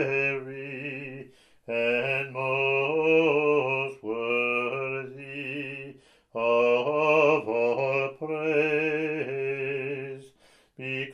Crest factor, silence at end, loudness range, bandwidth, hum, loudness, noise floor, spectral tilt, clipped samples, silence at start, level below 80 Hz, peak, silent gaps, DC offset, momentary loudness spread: 18 dB; 0 s; 4 LU; 10 kHz; none; -26 LUFS; -60 dBFS; -6.5 dB/octave; under 0.1%; 0 s; -74 dBFS; -10 dBFS; none; under 0.1%; 15 LU